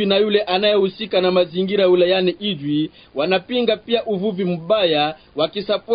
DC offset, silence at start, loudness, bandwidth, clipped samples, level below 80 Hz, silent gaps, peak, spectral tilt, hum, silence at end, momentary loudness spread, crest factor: under 0.1%; 0 s; -19 LUFS; 5.2 kHz; under 0.1%; -58 dBFS; none; -4 dBFS; -10.5 dB/octave; none; 0 s; 7 LU; 14 dB